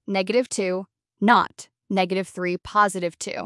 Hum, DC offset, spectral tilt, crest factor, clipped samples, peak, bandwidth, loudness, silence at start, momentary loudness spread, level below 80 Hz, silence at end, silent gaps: none; under 0.1%; -4.5 dB/octave; 20 dB; under 0.1%; -4 dBFS; 12 kHz; -23 LUFS; 0.1 s; 10 LU; -62 dBFS; 0 s; none